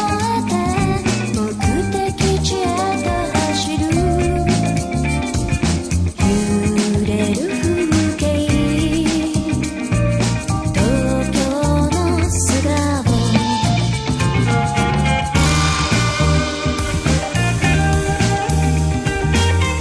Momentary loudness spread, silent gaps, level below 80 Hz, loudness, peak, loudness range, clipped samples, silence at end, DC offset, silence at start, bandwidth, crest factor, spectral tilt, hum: 4 LU; none; -26 dBFS; -17 LUFS; -2 dBFS; 2 LU; under 0.1%; 0 s; under 0.1%; 0 s; 11 kHz; 14 dB; -5 dB/octave; none